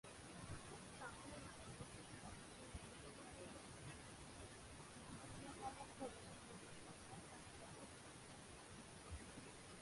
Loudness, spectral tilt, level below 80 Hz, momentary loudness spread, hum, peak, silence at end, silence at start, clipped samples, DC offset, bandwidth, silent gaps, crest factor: -56 LUFS; -4 dB/octave; -68 dBFS; 5 LU; none; -36 dBFS; 0 s; 0.05 s; under 0.1%; under 0.1%; 11.5 kHz; none; 20 dB